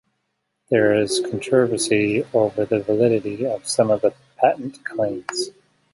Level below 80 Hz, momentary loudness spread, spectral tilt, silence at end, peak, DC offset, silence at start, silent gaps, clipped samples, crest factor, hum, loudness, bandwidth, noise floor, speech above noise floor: -60 dBFS; 8 LU; -4.5 dB/octave; 0.45 s; -2 dBFS; under 0.1%; 0.7 s; none; under 0.1%; 18 dB; none; -21 LUFS; 11.5 kHz; -74 dBFS; 55 dB